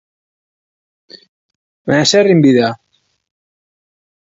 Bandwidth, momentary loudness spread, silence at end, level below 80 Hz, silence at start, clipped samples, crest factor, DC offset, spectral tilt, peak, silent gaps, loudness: 8 kHz; 17 LU; 1.6 s; -58 dBFS; 1.85 s; under 0.1%; 16 dB; under 0.1%; -5 dB/octave; 0 dBFS; none; -11 LUFS